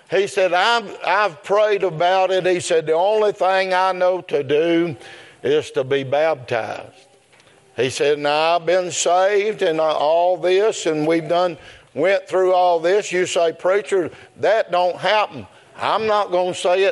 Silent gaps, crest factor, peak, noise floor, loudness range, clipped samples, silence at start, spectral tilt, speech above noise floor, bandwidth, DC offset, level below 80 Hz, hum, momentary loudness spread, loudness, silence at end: none; 16 dB; -2 dBFS; -52 dBFS; 3 LU; under 0.1%; 0.1 s; -3.5 dB/octave; 34 dB; 11.5 kHz; under 0.1%; -70 dBFS; none; 7 LU; -18 LUFS; 0 s